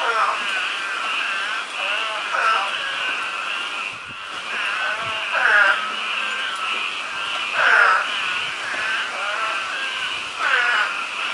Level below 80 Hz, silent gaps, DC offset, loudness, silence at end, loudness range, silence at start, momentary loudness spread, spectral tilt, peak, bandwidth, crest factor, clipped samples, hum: -70 dBFS; none; under 0.1%; -20 LUFS; 0 s; 4 LU; 0 s; 9 LU; 0.5 dB/octave; -2 dBFS; 11.5 kHz; 20 dB; under 0.1%; none